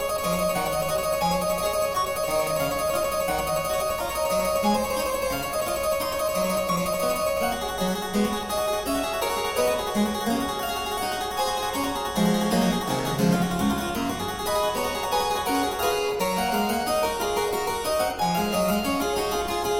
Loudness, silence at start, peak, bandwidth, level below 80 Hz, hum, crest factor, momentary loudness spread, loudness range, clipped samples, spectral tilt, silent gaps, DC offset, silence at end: -25 LUFS; 0 s; -10 dBFS; 17 kHz; -46 dBFS; none; 14 dB; 3 LU; 1 LU; under 0.1%; -4 dB/octave; none; under 0.1%; 0 s